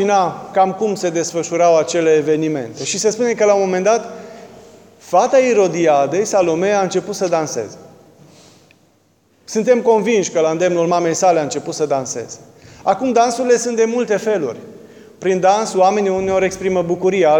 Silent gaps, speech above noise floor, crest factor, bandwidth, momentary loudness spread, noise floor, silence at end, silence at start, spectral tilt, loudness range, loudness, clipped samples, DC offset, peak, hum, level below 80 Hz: none; 41 dB; 16 dB; 17 kHz; 9 LU; -57 dBFS; 0 s; 0 s; -4.5 dB/octave; 4 LU; -16 LUFS; under 0.1%; under 0.1%; -2 dBFS; none; -58 dBFS